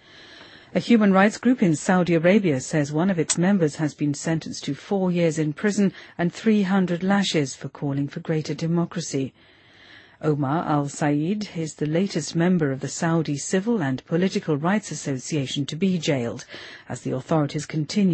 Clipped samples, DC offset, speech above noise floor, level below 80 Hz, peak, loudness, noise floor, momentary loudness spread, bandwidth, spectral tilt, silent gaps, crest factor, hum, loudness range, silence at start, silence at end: under 0.1%; under 0.1%; 27 dB; -62 dBFS; -4 dBFS; -23 LUFS; -50 dBFS; 10 LU; 8.8 kHz; -5.5 dB/octave; none; 18 dB; none; 6 LU; 0.15 s; 0 s